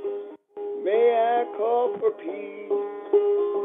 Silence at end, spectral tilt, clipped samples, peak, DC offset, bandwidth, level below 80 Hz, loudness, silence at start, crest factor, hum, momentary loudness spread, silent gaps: 0 s; -7.5 dB/octave; under 0.1%; -10 dBFS; under 0.1%; 3.8 kHz; under -90 dBFS; -24 LUFS; 0 s; 14 dB; none; 15 LU; none